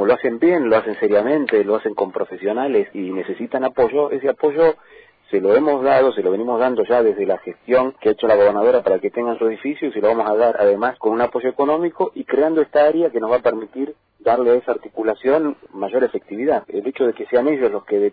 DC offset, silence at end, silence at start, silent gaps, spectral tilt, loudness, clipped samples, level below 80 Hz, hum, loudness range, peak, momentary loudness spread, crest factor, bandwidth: under 0.1%; 0.05 s; 0 s; none; -9.5 dB/octave; -18 LUFS; under 0.1%; -60 dBFS; none; 3 LU; -4 dBFS; 9 LU; 14 dB; 4.9 kHz